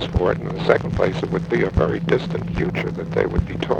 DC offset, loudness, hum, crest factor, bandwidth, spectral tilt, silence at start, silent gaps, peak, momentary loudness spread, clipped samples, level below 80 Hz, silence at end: under 0.1%; -21 LUFS; none; 20 dB; 8.6 kHz; -7.5 dB/octave; 0 s; none; 0 dBFS; 5 LU; under 0.1%; -32 dBFS; 0 s